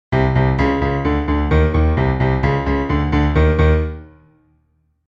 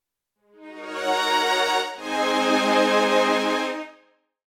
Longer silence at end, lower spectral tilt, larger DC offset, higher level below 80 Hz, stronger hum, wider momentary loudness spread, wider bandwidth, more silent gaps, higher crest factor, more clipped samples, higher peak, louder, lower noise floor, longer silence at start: first, 1 s vs 0.6 s; first, -9 dB/octave vs -2.5 dB/octave; neither; first, -22 dBFS vs -66 dBFS; neither; second, 4 LU vs 14 LU; second, 6 kHz vs 18 kHz; neither; about the same, 14 dB vs 16 dB; neither; first, -2 dBFS vs -8 dBFS; first, -17 LUFS vs -21 LUFS; second, -62 dBFS vs -70 dBFS; second, 0.1 s vs 0.6 s